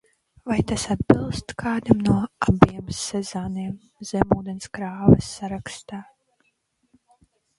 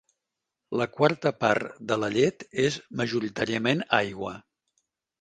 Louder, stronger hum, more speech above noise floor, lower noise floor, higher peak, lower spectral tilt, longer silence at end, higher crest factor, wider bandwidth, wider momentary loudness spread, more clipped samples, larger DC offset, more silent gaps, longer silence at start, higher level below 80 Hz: first, -23 LUFS vs -26 LUFS; neither; second, 48 dB vs 59 dB; second, -70 dBFS vs -85 dBFS; first, 0 dBFS vs -4 dBFS; first, -6.5 dB/octave vs -5 dB/octave; first, 1.55 s vs 0.8 s; about the same, 24 dB vs 22 dB; first, 11.5 kHz vs 9.4 kHz; first, 16 LU vs 9 LU; neither; neither; neither; second, 0.45 s vs 0.7 s; first, -42 dBFS vs -64 dBFS